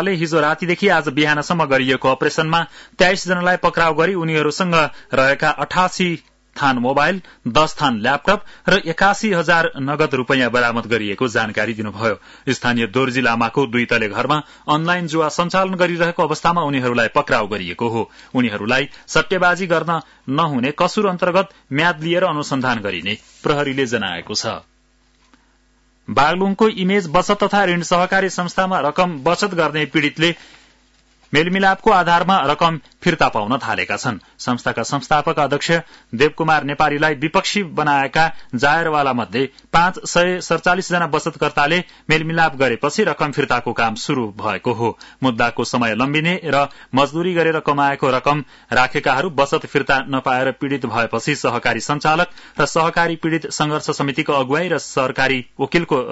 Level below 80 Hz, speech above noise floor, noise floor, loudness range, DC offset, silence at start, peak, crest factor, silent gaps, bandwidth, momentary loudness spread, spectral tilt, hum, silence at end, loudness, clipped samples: -48 dBFS; 40 dB; -57 dBFS; 2 LU; under 0.1%; 0 s; -2 dBFS; 16 dB; none; 8 kHz; 6 LU; -4.5 dB/octave; none; 0 s; -18 LUFS; under 0.1%